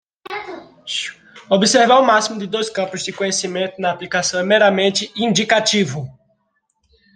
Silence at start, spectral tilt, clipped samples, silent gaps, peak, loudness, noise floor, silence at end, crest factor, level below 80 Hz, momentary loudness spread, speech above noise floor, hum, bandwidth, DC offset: 0.3 s; -3 dB/octave; under 0.1%; none; 0 dBFS; -17 LUFS; -68 dBFS; 1.05 s; 18 dB; -62 dBFS; 17 LU; 51 dB; none; 10.5 kHz; under 0.1%